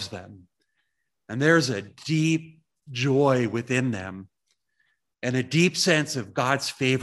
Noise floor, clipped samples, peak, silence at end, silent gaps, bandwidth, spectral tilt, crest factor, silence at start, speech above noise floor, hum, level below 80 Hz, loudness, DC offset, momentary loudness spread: -78 dBFS; under 0.1%; -6 dBFS; 0 s; none; 12.5 kHz; -5 dB/octave; 20 dB; 0 s; 53 dB; none; -68 dBFS; -24 LUFS; under 0.1%; 15 LU